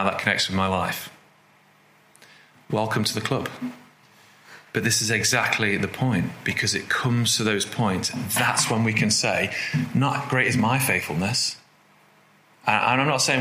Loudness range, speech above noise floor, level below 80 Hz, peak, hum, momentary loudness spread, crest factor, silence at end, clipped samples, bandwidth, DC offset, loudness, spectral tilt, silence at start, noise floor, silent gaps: 7 LU; 34 dB; -62 dBFS; -4 dBFS; none; 8 LU; 22 dB; 0 s; under 0.1%; 16 kHz; under 0.1%; -22 LUFS; -3.5 dB/octave; 0 s; -57 dBFS; none